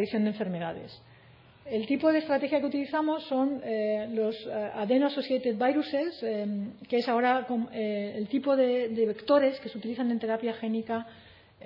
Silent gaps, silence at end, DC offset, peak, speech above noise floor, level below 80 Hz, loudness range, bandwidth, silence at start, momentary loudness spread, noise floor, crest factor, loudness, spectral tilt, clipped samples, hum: none; 0 s; under 0.1%; -12 dBFS; 27 dB; -74 dBFS; 2 LU; 5.8 kHz; 0 s; 9 LU; -56 dBFS; 18 dB; -29 LUFS; -8.5 dB/octave; under 0.1%; none